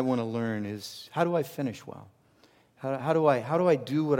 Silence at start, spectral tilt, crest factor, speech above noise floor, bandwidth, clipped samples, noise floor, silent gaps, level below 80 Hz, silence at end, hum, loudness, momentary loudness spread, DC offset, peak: 0 s; -7 dB/octave; 18 dB; 34 dB; 17 kHz; under 0.1%; -62 dBFS; none; -76 dBFS; 0 s; none; -29 LUFS; 14 LU; under 0.1%; -10 dBFS